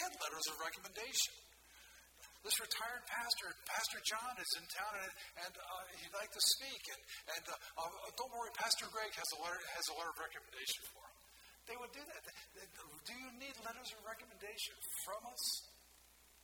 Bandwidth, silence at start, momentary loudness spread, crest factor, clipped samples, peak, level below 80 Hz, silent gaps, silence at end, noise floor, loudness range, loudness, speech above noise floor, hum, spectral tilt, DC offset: 19 kHz; 0 s; 18 LU; 26 dB; under 0.1%; -18 dBFS; -76 dBFS; none; 0 s; -67 dBFS; 9 LU; -42 LUFS; 22 dB; none; 1 dB/octave; under 0.1%